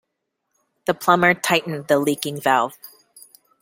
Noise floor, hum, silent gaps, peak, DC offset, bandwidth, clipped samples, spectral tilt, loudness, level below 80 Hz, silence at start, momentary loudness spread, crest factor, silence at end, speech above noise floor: -77 dBFS; none; none; 0 dBFS; under 0.1%; 17 kHz; under 0.1%; -4 dB/octave; -20 LUFS; -66 dBFS; 0.9 s; 10 LU; 22 dB; 0.75 s; 58 dB